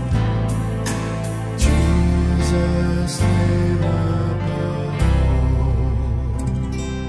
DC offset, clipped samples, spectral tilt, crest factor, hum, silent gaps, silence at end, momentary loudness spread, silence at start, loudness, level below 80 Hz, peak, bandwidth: under 0.1%; under 0.1%; -6.5 dB/octave; 14 dB; none; none; 0 s; 6 LU; 0 s; -20 LUFS; -22 dBFS; -4 dBFS; 11 kHz